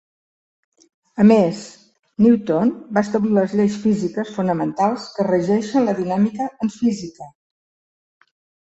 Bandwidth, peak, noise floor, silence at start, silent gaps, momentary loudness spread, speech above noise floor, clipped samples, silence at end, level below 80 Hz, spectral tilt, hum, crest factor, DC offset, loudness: 8 kHz; -2 dBFS; under -90 dBFS; 1.15 s; 1.99-2.03 s; 9 LU; over 72 dB; under 0.1%; 1.45 s; -60 dBFS; -7.5 dB/octave; none; 18 dB; under 0.1%; -19 LUFS